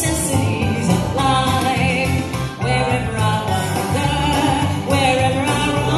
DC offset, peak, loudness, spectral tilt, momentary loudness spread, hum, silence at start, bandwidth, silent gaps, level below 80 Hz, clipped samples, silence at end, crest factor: under 0.1%; -2 dBFS; -18 LUFS; -5 dB/octave; 4 LU; none; 0 s; 14.5 kHz; none; -34 dBFS; under 0.1%; 0 s; 14 dB